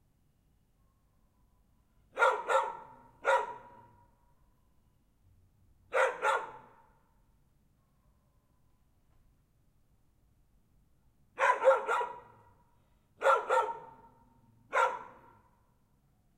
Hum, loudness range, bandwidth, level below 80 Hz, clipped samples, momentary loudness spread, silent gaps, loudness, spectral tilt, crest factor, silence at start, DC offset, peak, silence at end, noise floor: none; 6 LU; 14 kHz; -72 dBFS; under 0.1%; 19 LU; none; -30 LUFS; -2 dB/octave; 24 dB; 2.15 s; under 0.1%; -12 dBFS; 1.3 s; -70 dBFS